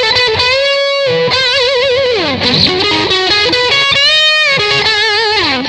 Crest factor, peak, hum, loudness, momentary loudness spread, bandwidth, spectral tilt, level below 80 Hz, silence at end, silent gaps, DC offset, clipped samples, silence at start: 10 dB; 0 dBFS; none; -9 LUFS; 5 LU; 10.5 kHz; -3 dB/octave; -42 dBFS; 0 s; none; 0.2%; under 0.1%; 0 s